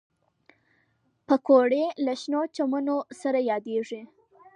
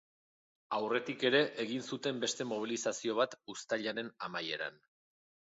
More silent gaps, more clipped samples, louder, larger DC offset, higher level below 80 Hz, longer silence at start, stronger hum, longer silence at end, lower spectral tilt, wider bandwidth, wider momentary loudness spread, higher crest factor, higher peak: neither; neither; first, -25 LUFS vs -35 LUFS; neither; about the same, -82 dBFS vs -84 dBFS; first, 1.3 s vs 0.7 s; neither; second, 0.5 s vs 0.7 s; first, -5 dB/octave vs -2 dB/octave; first, 10.5 kHz vs 8 kHz; about the same, 11 LU vs 10 LU; about the same, 20 dB vs 22 dB; first, -6 dBFS vs -14 dBFS